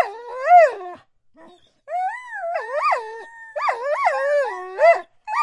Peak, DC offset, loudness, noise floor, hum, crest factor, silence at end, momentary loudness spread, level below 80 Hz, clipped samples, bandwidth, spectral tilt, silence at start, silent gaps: -4 dBFS; under 0.1%; -20 LUFS; -51 dBFS; none; 18 dB; 0 s; 19 LU; -74 dBFS; under 0.1%; 10.5 kHz; -1.5 dB/octave; 0 s; none